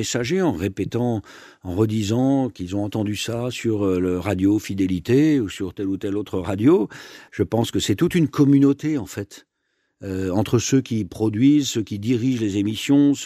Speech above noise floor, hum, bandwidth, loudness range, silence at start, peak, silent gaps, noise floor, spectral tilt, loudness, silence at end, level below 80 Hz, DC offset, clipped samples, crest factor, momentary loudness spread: 51 dB; none; 14.5 kHz; 3 LU; 0 s; -6 dBFS; none; -72 dBFS; -6 dB/octave; -21 LUFS; 0 s; -52 dBFS; under 0.1%; under 0.1%; 16 dB; 10 LU